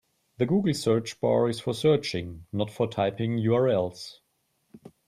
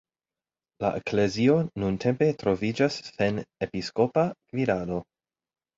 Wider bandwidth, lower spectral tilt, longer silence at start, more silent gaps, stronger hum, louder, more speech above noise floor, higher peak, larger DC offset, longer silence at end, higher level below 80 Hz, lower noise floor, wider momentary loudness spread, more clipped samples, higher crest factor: first, 14.5 kHz vs 8 kHz; about the same, -6.5 dB/octave vs -6.5 dB/octave; second, 0.4 s vs 0.8 s; neither; neither; about the same, -26 LUFS vs -27 LUFS; second, 47 dB vs over 64 dB; about the same, -10 dBFS vs -8 dBFS; neither; second, 0.2 s vs 0.75 s; second, -62 dBFS vs -56 dBFS; second, -73 dBFS vs under -90 dBFS; about the same, 10 LU vs 9 LU; neither; about the same, 16 dB vs 18 dB